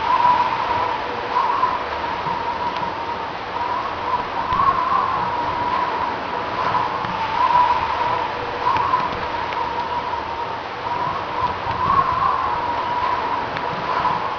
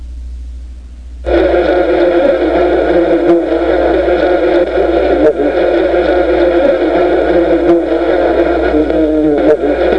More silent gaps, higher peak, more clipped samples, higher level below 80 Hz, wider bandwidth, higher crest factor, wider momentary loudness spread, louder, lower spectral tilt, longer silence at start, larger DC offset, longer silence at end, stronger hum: neither; second, -6 dBFS vs 0 dBFS; neither; second, -46 dBFS vs -28 dBFS; second, 5.4 kHz vs 6 kHz; first, 16 dB vs 10 dB; first, 7 LU vs 3 LU; second, -21 LUFS vs -11 LUFS; second, -5 dB/octave vs -7.5 dB/octave; about the same, 0 s vs 0 s; second, under 0.1% vs 1%; about the same, 0 s vs 0 s; neither